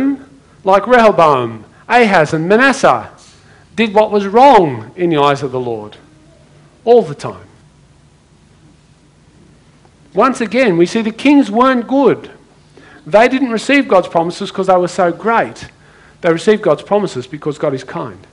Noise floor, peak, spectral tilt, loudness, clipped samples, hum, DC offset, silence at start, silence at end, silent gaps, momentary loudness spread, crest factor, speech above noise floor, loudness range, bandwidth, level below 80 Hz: -47 dBFS; 0 dBFS; -5.5 dB/octave; -12 LUFS; 0.3%; none; under 0.1%; 0 s; 0.15 s; none; 14 LU; 14 dB; 35 dB; 8 LU; 11 kHz; -50 dBFS